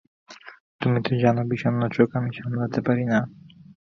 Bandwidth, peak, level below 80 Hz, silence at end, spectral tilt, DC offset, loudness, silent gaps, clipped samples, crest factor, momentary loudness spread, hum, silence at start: 6.6 kHz; -4 dBFS; -58 dBFS; 0.65 s; -8.5 dB/octave; under 0.1%; -24 LUFS; 0.60-0.79 s; under 0.1%; 22 dB; 15 LU; none; 0.3 s